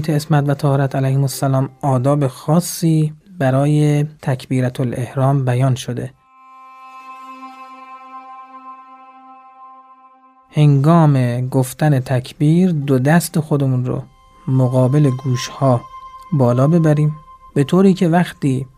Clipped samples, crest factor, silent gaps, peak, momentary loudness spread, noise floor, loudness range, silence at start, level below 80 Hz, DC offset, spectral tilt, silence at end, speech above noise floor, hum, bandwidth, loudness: under 0.1%; 14 dB; none; -2 dBFS; 22 LU; -48 dBFS; 17 LU; 0 s; -52 dBFS; under 0.1%; -7.5 dB/octave; 0.1 s; 33 dB; none; 15.5 kHz; -16 LUFS